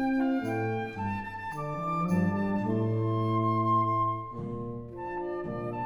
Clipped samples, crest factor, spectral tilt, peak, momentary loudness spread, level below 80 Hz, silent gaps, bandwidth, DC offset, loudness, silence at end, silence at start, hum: under 0.1%; 14 dB; -9 dB/octave; -16 dBFS; 11 LU; -54 dBFS; none; 12 kHz; under 0.1%; -30 LUFS; 0 s; 0 s; none